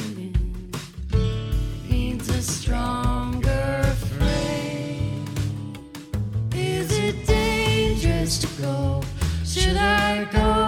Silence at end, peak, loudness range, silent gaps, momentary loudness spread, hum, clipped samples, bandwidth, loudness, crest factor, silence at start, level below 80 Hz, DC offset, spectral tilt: 0 s; -6 dBFS; 4 LU; none; 8 LU; none; under 0.1%; 17.5 kHz; -24 LUFS; 16 dB; 0 s; -28 dBFS; under 0.1%; -5 dB/octave